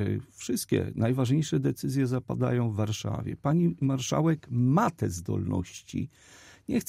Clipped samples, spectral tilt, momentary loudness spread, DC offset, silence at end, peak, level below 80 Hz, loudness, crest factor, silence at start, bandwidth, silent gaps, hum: under 0.1%; -6.5 dB/octave; 9 LU; under 0.1%; 0.05 s; -14 dBFS; -56 dBFS; -28 LUFS; 14 dB; 0 s; 16 kHz; none; none